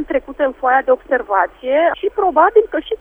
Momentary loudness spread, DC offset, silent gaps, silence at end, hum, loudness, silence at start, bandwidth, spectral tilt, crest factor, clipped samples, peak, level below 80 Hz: 7 LU; under 0.1%; none; 0.05 s; none; -16 LUFS; 0 s; 3.7 kHz; -6 dB/octave; 16 dB; under 0.1%; 0 dBFS; -46 dBFS